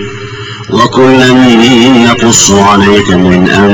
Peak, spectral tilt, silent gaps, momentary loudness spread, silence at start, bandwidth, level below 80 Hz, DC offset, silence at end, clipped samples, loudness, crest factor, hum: 0 dBFS; -4 dB/octave; none; 14 LU; 0 s; over 20 kHz; -32 dBFS; under 0.1%; 0 s; 4%; -4 LUFS; 4 dB; none